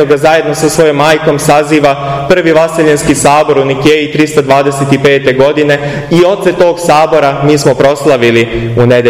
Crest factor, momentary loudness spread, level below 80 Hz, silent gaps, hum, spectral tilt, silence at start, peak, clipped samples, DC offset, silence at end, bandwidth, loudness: 8 dB; 3 LU; -36 dBFS; none; none; -5 dB/octave; 0 s; 0 dBFS; 3%; 0.4%; 0 s; 16 kHz; -8 LUFS